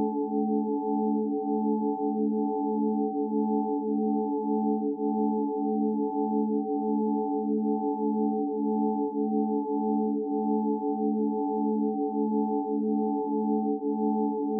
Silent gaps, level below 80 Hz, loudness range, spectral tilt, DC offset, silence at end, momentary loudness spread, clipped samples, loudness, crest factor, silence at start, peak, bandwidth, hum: none; -88 dBFS; 0 LU; -0.5 dB/octave; under 0.1%; 0 s; 1 LU; under 0.1%; -28 LUFS; 12 dB; 0 s; -16 dBFS; 1 kHz; none